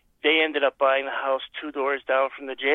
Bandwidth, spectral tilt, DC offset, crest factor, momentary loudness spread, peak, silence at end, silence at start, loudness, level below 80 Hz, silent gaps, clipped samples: 4.1 kHz; -4.5 dB/octave; under 0.1%; 16 dB; 8 LU; -8 dBFS; 0 s; 0.25 s; -24 LUFS; -70 dBFS; none; under 0.1%